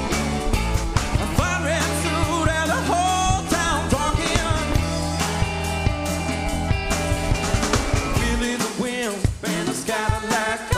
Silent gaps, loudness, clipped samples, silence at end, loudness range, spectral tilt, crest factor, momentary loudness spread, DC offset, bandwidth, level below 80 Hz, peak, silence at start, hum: none; -22 LUFS; under 0.1%; 0 s; 2 LU; -4.5 dB/octave; 20 dB; 3 LU; under 0.1%; 15.5 kHz; -28 dBFS; -2 dBFS; 0 s; none